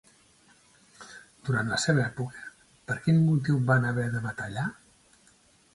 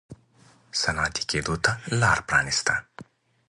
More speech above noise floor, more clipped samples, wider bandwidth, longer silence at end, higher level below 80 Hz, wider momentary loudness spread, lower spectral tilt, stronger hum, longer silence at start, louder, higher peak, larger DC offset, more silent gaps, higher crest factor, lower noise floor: about the same, 35 dB vs 32 dB; neither; about the same, 11.5 kHz vs 11.5 kHz; first, 1 s vs 0.45 s; second, -60 dBFS vs -46 dBFS; first, 23 LU vs 5 LU; first, -6 dB/octave vs -3 dB/octave; neither; first, 1 s vs 0.1 s; second, -27 LUFS vs -24 LUFS; second, -10 dBFS vs -4 dBFS; neither; neither; about the same, 20 dB vs 22 dB; first, -61 dBFS vs -57 dBFS